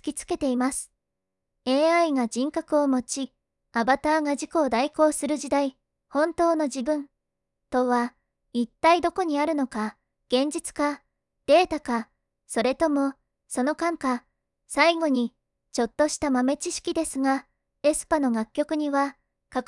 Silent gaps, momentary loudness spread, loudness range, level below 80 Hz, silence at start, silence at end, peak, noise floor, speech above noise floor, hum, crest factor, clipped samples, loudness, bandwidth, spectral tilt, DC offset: none; 11 LU; 2 LU; -58 dBFS; 0.05 s; 0.05 s; -6 dBFS; -84 dBFS; 60 dB; none; 18 dB; under 0.1%; -25 LUFS; 12 kHz; -3 dB/octave; under 0.1%